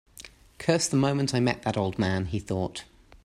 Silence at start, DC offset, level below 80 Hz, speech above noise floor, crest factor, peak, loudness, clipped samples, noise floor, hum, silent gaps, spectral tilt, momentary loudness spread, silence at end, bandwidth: 0.2 s; under 0.1%; -54 dBFS; 23 dB; 20 dB; -8 dBFS; -27 LUFS; under 0.1%; -50 dBFS; none; none; -5 dB/octave; 13 LU; 0.4 s; 15 kHz